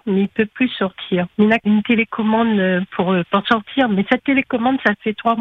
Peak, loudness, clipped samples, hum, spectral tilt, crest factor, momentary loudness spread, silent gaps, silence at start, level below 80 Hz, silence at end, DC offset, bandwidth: -2 dBFS; -18 LUFS; under 0.1%; none; -8 dB/octave; 16 dB; 4 LU; none; 0.05 s; -56 dBFS; 0 s; under 0.1%; 5.4 kHz